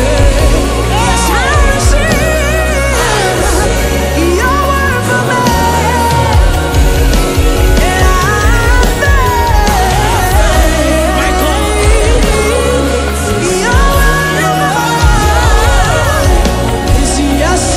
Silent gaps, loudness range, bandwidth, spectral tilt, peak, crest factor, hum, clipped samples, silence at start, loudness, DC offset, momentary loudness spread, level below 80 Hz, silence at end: none; 1 LU; 16 kHz; -4.5 dB/octave; 0 dBFS; 8 dB; none; 0.3%; 0 s; -10 LUFS; under 0.1%; 2 LU; -12 dBFS; 0 s